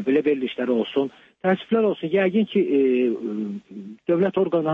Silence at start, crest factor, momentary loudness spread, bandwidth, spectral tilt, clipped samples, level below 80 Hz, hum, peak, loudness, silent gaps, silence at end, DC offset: 0 s; 14 dB; 10 LU; 4.2 kHz; -8.5 dB/octave; under 0.1%; -70 dBFS; none; -8 dBFS; -22 LUFS; none; 0 s; under 0.1%